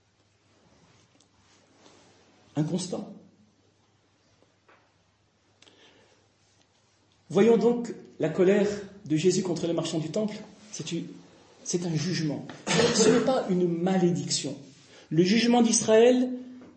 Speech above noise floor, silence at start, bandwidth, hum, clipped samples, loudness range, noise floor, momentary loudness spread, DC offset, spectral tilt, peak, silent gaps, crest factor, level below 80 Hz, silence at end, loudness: 42 dB; 2.55 s; 8.8 kHz; none; under 0.1%; 14 LU; -67 dBFS; 17 LU; under 0.1%; -4.5 dB/octave; -8 dBFS; none; 20 dB; -70 dBFS; 0.1 s; -25 LUFS